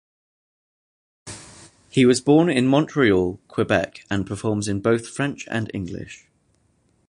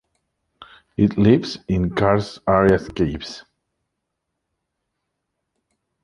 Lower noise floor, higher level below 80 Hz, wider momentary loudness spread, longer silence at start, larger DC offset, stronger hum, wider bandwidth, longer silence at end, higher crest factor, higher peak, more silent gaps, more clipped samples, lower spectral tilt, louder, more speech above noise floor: second, -64 dBFS vs -78 dBFS; second, -50 dBFS vs -42 dBFS; first, 19 LU vs 16 LU; first, 1.25 s vs 0.6 s; neither; neither; about the same, 11.5 kHz vs 11 kHz; second, 0.95 s vs 2.65 s; about the same, 20 dB vs 20 dB; about the same, -2 dBFS vs -2 dBFS; neither; neither; second, -5.5 dB/octave vs -7.5 dB/octave; about the same, -21 LUFS vs -19 LUFS; second, 44 dB vs 60 dB